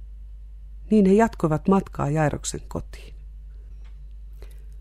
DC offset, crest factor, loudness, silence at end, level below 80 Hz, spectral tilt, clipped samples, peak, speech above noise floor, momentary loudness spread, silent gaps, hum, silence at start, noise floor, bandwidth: under 0.1%; 18 dB; -22 LUFS; 0 s; -40 dBFS; -7 dB/octave; under 0.1%; -6 dBFS; 18 dB; 25 LU; none; none; 0 s; -40 dBFS; 12.5 kHz